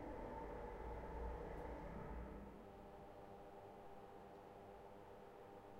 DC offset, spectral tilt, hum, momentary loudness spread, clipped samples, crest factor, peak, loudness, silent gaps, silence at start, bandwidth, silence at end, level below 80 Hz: under 0.1%; -7.5 dB/octave; none; 9 LU; under 0.1%; 16 dB; -38 dBFS; -55 LUFS; none; 0 s; 16 kHz; 0 s; -58 dBFS